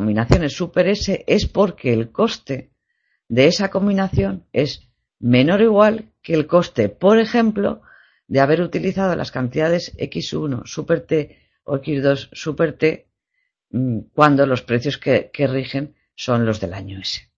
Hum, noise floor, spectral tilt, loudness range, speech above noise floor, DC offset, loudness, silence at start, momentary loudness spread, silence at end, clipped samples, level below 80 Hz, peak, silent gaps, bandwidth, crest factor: none; -73 dBFS; -6.5 dB/octave; 5 LU; 55 dB; under 0.1%; -19 LUFS; 0 s; 12 LU; 0.15 s; under 0.1%; -40 dBFS; 0 dBFS; none; 7.8 kHz; 18 dB